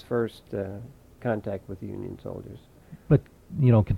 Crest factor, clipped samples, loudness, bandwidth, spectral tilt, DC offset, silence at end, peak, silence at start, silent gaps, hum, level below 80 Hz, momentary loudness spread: 18 dB; under 0.1%; -28 LUFS; 4.9 kHz; -10 dB/octave; under 0.1%; 0 s; -8 dBFS; 0.1 s; none; none; -48 dBFS; 19 LU